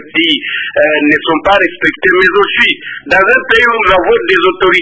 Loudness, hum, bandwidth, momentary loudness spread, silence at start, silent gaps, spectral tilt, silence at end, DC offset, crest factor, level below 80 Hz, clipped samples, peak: -9 LUFS; none; 8 kHz; 4 LU; 0 s; none; -4.5 dB/octave; 0 s; under 0.1%; 10 dB; -40 dBFS; 0.3%; 0 dBFS